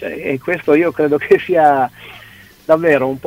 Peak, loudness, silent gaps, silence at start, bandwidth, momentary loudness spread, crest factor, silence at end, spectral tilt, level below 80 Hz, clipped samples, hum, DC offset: 0 dBFS; -14 LUFS; none; 0 s; 16 kHz; 14 LU; 14 dB; 0.05 s; -7 dB/octave; -54 dBFS; under 0.1%; none; under 0.1%